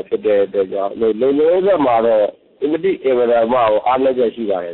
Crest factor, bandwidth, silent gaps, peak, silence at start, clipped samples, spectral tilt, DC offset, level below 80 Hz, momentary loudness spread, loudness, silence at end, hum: 10 dB; 4.2 kHz; none; -6 dBFS; 0.1 s; under 0.1%; -10 dB/octave; under 0.1%; -54 dBFS; 6 LU; -16 LUFS; 0 s; none